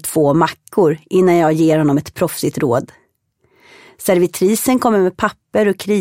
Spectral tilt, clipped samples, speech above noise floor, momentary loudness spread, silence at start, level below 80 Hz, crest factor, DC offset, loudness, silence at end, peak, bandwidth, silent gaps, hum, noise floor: -6 dB/octave; under 0.1%; 47 dB; 6 LU; 0.05 s; -54 dBFS; 16 dB; under 0.1%; -15 LUFS; 0 s; 0 dBFS; 16.5 kHz; none; none; -62 dBFS